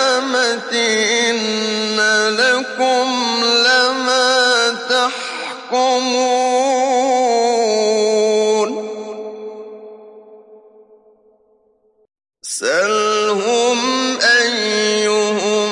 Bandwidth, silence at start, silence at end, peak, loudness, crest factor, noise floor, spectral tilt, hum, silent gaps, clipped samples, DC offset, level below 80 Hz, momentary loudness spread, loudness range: 11.5 kHz; 0 s; 0 s; -2 dBFS; -15 LUFS; 14 dB; -58 dBFS; -1.5 dB/octave; none; none; under 0.1%; under 0.1%; -74 dBFS; 12 LU; 9 LU